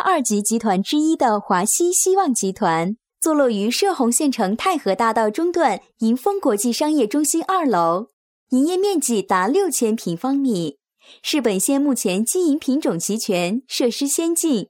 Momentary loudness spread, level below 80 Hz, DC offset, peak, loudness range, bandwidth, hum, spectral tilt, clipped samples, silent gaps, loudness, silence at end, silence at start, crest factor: 5 LU; -66 dBFS; under 0.1%; -4 dBFS; 2 LU; 17.5 kHz; none; -3.5 dB/octave; under 0.1%; 8.13-8.47 s; -19 LUFS; 0.05 s; 0 s; 16 dB